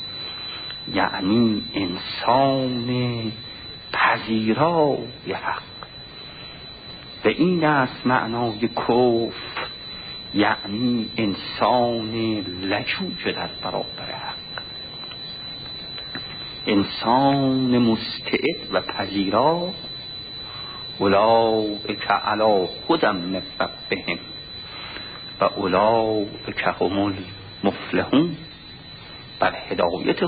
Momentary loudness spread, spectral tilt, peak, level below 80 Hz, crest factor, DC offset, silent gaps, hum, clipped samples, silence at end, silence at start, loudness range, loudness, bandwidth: 14 LU; -10.5 dB/octave; -4 dBFS; -52 dBFS; 18 dB; under 0.1%; none; none; under 0.1%; 0 s; 0 s; 4 LU; -23 LUFS; 5 kHz